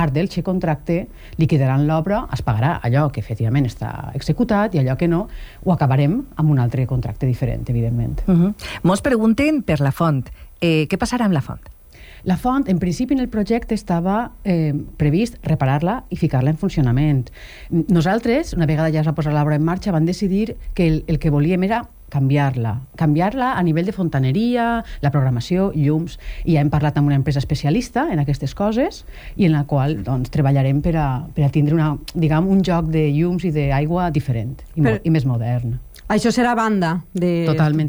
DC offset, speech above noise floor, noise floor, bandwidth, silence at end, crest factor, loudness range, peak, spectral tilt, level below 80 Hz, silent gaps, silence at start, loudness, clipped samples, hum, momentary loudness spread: under 0.1%; 24 dB; -42 dBFS; over 20 kHz; 0 s; 12 dB; 2 LU; -6 dBFS; -8 dB/octave; -36 dBFS; none; 0 s; -19 LUFS; under 0.1%; none; 6 LU